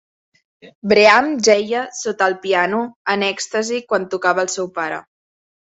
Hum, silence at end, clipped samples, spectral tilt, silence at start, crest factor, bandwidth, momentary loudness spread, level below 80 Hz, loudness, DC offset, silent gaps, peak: none; 0.65 s; under 0.1%; -3 dB/octave; 0.65 s; 18 dB; 8.2 kHz; 12 LU; -62 dBFS; -17 LUFS; under 0.1%; 0.75-0.82 s, 2.96-3.05 s; 0 dBFS